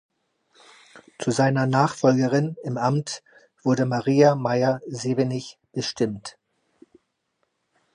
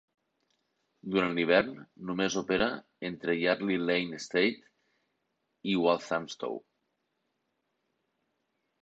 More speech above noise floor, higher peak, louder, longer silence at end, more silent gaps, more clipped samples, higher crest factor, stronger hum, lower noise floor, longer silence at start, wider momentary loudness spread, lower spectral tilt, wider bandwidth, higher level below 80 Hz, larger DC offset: about the same, 52 dB vs 50 dB; first, -4 dBFS vs -12 dBFS; first, -23 LUFS vs -30 LUFS; second, 1.65 s vs 2.25 s; neither; neither; about the same, 20 dB vs 22 dB; neither; second, -74 dBFS vs -80 dBFS; about the same, 0.95 s vs 1.05 s; about the same, 14 LU vs 13 LU; first, -6 dB/octave vs -4.5 dB/octave; first, 10.5 kHz vs 8.2 kHz; about the same, -66 dBFS vs -66 dBFS; neither